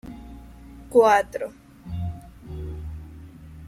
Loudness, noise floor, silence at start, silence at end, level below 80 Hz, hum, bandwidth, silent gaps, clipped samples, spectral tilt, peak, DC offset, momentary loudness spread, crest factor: -23 LUFS; -44 dBFS; 0.05 s; 0 s; -44 dBFS; none; 15 kHz; none; under 0.1%; -6 dB/octave; -4 dBFS; under 0.1%; 27 LU; 22 dB